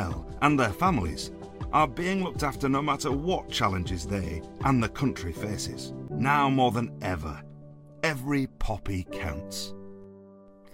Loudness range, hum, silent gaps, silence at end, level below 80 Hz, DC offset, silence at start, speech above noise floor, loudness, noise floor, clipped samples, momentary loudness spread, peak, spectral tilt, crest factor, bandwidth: 6 LU; none; none; 0 s; -42 dBFS; under 0.1%; 0 s; 24 dB; -28 LUFS; -51 dBFS; under 0.1%; 13 LU; -8 dBFS; -5.5 dB/octave; 20 dB; 16 kHz